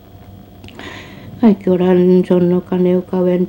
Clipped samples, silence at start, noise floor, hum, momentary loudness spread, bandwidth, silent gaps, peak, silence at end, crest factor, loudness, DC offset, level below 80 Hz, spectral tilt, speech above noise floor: under 0.1%; 0.35 s; -38 dBFS; none; 20 LU; 16.5 kHz; none; 0 dBFS; 0 s; 14 dB; -13 LUFS; under 0.1%; -48 dBFS; -9.5 dB/octave; 25 dB